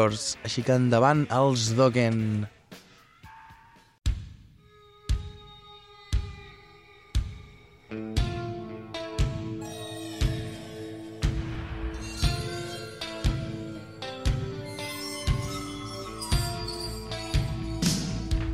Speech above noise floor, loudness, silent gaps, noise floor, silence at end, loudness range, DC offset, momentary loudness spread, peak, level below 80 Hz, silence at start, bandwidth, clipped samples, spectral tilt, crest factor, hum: 31 dB; -29 LUFS; none; -55 dBFS; 0 s; 11 LU; under 0.1%; 20 LU; -8 dBFS; -36 dBFS; 0 s; 15.5 kHz; under 0.1%; -5.5 dB/octave; 22 dB; none